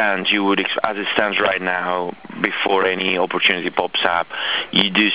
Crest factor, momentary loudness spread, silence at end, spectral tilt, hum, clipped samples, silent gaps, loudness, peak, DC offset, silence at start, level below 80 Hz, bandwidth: 20 dB; 5 LU; 0 s; -7.5 dB/octave; none; under 0.1%; none; -18 LUFS; 0 dBFS; 0.4%; 0 s; -60 dBFS; 4 kHz